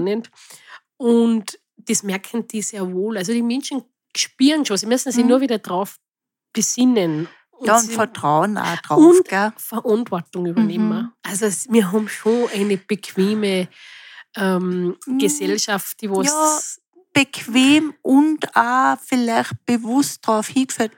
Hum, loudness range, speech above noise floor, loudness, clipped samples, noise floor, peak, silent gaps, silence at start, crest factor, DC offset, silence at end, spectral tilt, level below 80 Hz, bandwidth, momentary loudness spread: none; 5 LU; 66 dB; -19 LUFS; under 0.1%; -85 dBFS; 0 dBFS; 16.88-16.92 s; 0 s; 18 dB; under 0.1%; 0.1 s; -4 dB/octave; -74 dBFS; 17 kHz; 10 LU